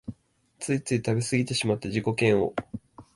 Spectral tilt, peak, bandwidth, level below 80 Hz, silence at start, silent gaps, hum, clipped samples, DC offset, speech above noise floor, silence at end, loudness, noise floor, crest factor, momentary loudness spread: -5.5 dB/octave; -8 dBFS; 11.5 kHz; -56 dBFS; 0.05 s; none; none; under 0.1%; under 0.1%; 35 dB; 0.15 s; -26 LUFS; -61 dBFS; 18 dB; 16 LU